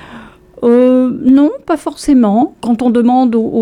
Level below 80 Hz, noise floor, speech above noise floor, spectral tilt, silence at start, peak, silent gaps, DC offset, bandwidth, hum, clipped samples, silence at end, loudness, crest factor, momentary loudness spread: -44 dBFS; -35 dBFS; 24 dB; -7 dB/octave; 0.05 s; -2 dBFS; none; under 0.1%; 11.5 kHz; none; under 0.1%; 0 s; -11 LUFS; 10 dB; 7 LU